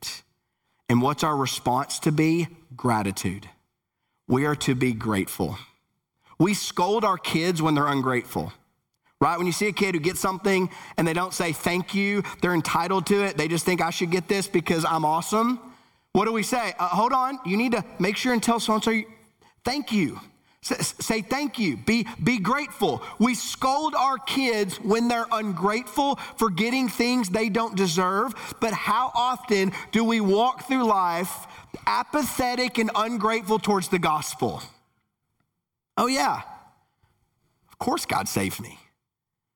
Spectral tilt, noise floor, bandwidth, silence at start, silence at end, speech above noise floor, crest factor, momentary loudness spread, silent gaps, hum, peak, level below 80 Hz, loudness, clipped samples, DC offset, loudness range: -4.5 dB/octave; -85 dBFS; over 20 kHz; 0 s; 0.8 s; 61 dB; 18 dB; 7 LU; none; none; -6 dBFS; -58 dBFS; -24 LUFS; under 0.1%; under 0.1%; 3 LU